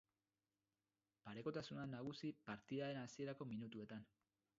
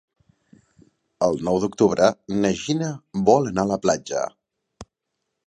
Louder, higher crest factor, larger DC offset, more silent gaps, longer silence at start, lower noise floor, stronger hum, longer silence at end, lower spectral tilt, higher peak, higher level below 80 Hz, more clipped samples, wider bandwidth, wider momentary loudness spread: second, -51 LUFS vs -22 LUFS; about the same, 18 dB vs 22 dB; neither; neither; about the same, 1.25 s vs 1.2 s; first, under -90 dBFS vs -79 dBFS; neither; about the same, 0.55 s vs 0.65 s; about the same, -5.5 dB/octave vs -5.5 dB/octave; second, -34 dBFS vs -2 dBFS; second, -84 dBFS vs -54 dBFS; neither; second, 7.4 kHz vs 10.5 kHz; about the same, 9 LU vs 9 LU